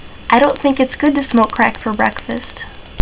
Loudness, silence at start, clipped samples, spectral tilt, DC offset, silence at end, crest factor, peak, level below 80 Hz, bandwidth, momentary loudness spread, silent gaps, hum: -15 LUFS; 0 s; 0.6%; -9.5 dB/octave; under 0.1%; 0 s; 14 dB; 0 dBFS; -38 dBFS; 4 kHz; 15 LU; none; none